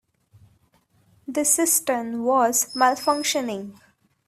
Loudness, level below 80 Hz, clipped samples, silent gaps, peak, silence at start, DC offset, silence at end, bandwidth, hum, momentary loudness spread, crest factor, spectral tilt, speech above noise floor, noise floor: -21 LUFS; -68 dBFS; under 0.1%; none; -4 dBFS; 1.3 s; under 0.1%; 0.55 s; 16 kHz; none; 13 LU; 20 dB; -1.5 dB/octave; 41 dB; -63 dBFS